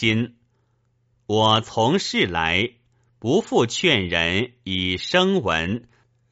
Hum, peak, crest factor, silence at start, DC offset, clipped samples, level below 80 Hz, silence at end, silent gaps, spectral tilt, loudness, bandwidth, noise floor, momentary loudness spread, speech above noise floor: none; -4 dBFS; 18 dB; 0 s; under 0.1%; under 0.1%; -50 dBFS; 0.55 s; none; -3 dB/octave; -21 LUFS; 8 kHz; -66 dBFS; 8 LU; 45 dB